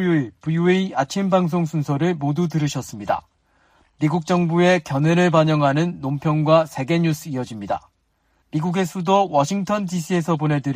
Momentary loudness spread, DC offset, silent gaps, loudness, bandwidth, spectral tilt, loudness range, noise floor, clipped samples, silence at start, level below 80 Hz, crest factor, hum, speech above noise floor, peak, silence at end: 9 LU; under 0.1%; none; -20 LUFS; 15.5 kHz; -6.5 dB/octave; 4 LU; -65 dBFS; under 0.1%; 0 s; -58 dBFS; 16 dB; none; 46 dB; -4 dBFS; 0 s